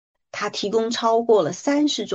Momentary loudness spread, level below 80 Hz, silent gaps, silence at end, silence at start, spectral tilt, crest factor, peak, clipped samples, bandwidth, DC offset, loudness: 10 LU; -70 dBFS; none; 0 s; 0.35 s; -4 dB/octave; 16 dB; -6 dBFS; under 0.1%; 8.2 kHz; under 0.1%; -21 LUFS